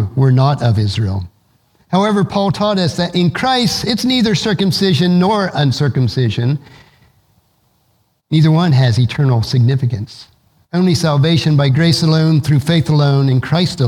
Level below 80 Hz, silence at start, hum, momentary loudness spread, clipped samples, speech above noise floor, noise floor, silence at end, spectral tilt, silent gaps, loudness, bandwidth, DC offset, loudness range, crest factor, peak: -46 dBFS; 0 s; none; 6 LU; under 0.1%; 47 dB; -60 dBFS; 0 s; -6.5 dB/octave; none; -14 LUFS; 14 kHz; under 0.1%; 3 LU; 14 dB; 0 dBFS